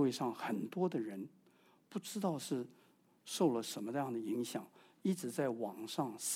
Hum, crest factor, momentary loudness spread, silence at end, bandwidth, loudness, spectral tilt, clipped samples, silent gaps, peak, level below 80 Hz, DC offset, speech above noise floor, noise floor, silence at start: none; 18 dB; 12 LU; 0 s; 17 kHz; -39 LUFS; -5 dB/octave; under 0.1%; none; -22 dBFS; -88 dBFS; under 0.1%; 30 dB; -69 dBFS; 0 s